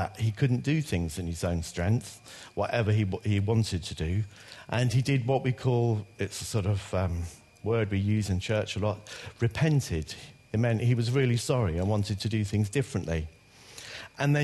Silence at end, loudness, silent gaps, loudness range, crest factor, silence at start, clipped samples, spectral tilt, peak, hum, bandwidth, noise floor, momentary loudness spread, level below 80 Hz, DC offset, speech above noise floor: 0 s; -29 LUFS; none; 2 LU; 16 dB; 0 s; under 0.1%; -6.5 dB/octave; -12 dBFS; none; 12.5 kHz; -49 dBFS; 13 LU; -48 dBFS; under 0.1%; 21 dB